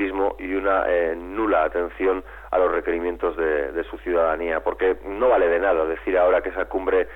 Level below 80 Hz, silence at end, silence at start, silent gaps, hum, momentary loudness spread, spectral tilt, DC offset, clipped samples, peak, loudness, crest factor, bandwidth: -44 dBFS; 0 s; 0 s; none; none; 7 LU; -7.5 dB/octave; under 0.1%; under 0.1%; -8 dBFS; -22 LUFS; 14 dB; 4 kHz